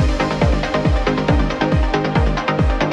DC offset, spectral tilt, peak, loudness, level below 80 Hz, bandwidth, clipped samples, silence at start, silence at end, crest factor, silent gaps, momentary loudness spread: under 0.1%; -7 dB/octave; -2 dBFS; -18 LUFS; -20 dBFS; 9.2 kHz; under 0.1%; 0 s; 0 s; 14 dB; none; 1 LU